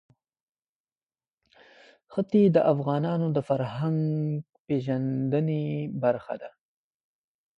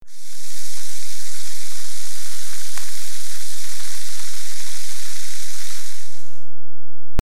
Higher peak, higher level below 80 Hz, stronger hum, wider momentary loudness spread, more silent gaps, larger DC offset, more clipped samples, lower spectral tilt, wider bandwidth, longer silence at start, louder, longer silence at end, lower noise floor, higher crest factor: second, -10 dBFS vs -2 dBFS; second, -66 dBFS vs -48 dBFS; neither; first, 12 LU vs 4 LU; first, 4.60-4.65 s vs none; second, under 0.1% vs 50%; neither; first, -10 dB/octave vs -2 dB/octave; second, 5.2 kHz vs 18 kHz; first, 2.1 s vs 0 s; first, -27 LUFS vs -31 LUFS; first, 1.1 s vs 0 s; first, under -90 dBFS vs -60 dBFS; about the same, 18 dB vs 16 dB